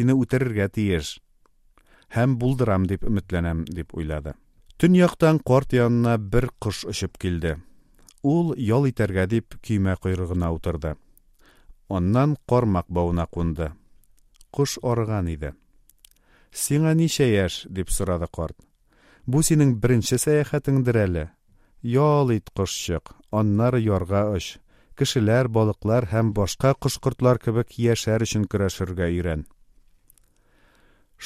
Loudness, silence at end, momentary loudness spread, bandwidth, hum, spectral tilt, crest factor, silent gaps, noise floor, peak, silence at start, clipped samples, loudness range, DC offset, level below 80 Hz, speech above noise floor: -23 LUFS; 0 s; 11 LU; 15.5 kHz; none; -6 dB/octave; 20 dB; none; -59 dBFS; -4 dBFS; 0 s; under 0.1%; 4 LU; under 0.1%; -40 dBFS; 37 dB